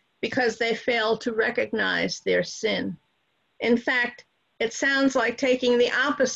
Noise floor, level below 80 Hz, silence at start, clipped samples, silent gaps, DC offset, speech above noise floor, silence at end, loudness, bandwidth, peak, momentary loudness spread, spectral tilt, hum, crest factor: -71 dBFS; -64 dBFS; 0.2 s; under 0.1%; none; under 0.1%; 47 dB; 0 s; -24 LUFS; 8 kHz; -10 dBFS; 8 LU; -3.5 dB/octave; none; 14 dB